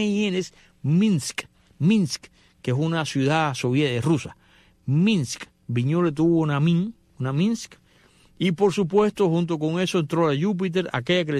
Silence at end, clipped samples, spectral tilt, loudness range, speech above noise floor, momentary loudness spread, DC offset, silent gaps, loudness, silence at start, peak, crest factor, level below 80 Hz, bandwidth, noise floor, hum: 0 s; under 0.1%; -6 dB/octave; 1 LU; 35 dB; 11 LU; under 0.1%; none; -23 LUFS; 0 s; -8 dBFS; 16 dB; -60 dBFS; 13 kHz; -57 dBFS; none